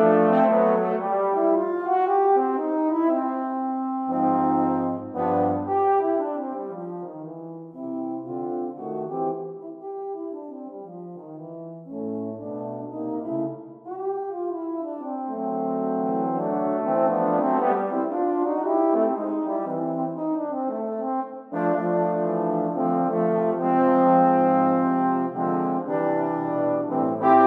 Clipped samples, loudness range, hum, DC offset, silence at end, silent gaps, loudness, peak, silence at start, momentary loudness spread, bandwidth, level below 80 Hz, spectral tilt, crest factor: under 0.1%; 12 LU; none; under 0.1%; 0 s; none; -24 LUFS; -4 dBFS; 0 s; 15 LU; 4.2 kHz; -78 dBFS; -10.5 dB/octave; 18 dB